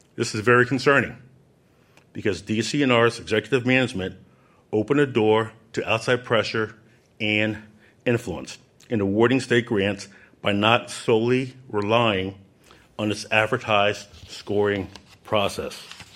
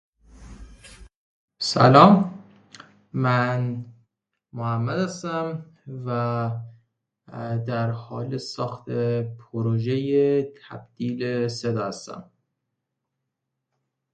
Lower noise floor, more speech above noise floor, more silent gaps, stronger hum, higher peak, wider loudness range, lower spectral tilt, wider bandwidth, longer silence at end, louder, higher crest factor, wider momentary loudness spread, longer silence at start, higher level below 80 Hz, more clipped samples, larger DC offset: second, -58 dBFS vs -81 dBFS; second, 36 dB vs 59 dB; second, none vs 1.16-1.48 s; neither; about the same, -2 dBFS vs 0 dBFS; second, 3 LU vs 9 LU; second, -5 dB/octave vs -6.5 dB/octave; first, 15 kHz vs 9.2 kHz; second, 0.15 s vs 1.9 s; about the same, -22 LUFS vs -23 LUFS; about the same, 22 dB vs 24 dB; second, 15 LU vs 19 LU; second, 0.15 s vs 0.35 s; about the same, -58 dBFS vs -56 dBFS; neither; neither